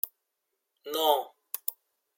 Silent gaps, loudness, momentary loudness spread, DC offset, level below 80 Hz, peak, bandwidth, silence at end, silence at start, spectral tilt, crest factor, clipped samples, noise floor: none; -30 LUFS; 12 LU; under 0.1%; under -90 dBFS; -10 dBFS; 17 kHz; 0.45 s; 0.05 s; 0 dB/octave; 24 dB; under 0.1%; -82 dBFS